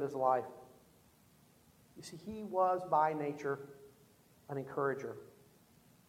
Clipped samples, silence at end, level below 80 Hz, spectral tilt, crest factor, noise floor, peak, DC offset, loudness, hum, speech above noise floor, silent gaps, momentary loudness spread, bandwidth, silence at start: under 0.1%; 0.8 s; -76 dBFS; -6.5 dB/octave; 20 dB; -66 dBFS; -18 dBFS; under 0.1%; -36 LUFS; none; 30 dB; none; 21 LU; 16.5 kHz; 0 s